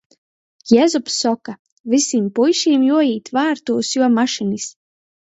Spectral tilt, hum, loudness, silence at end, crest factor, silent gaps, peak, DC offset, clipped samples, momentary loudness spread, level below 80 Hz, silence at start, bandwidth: -3.5 dB/octave; none; -17 LUFS; 0.6 s; 18 dB; 1.59-1.65 s, 1.72-1.84 s; 0 dBFS; under 0.1%; under 0.1%; 12 LU; -66 dBFS; 0.65 s; 8.2 kHz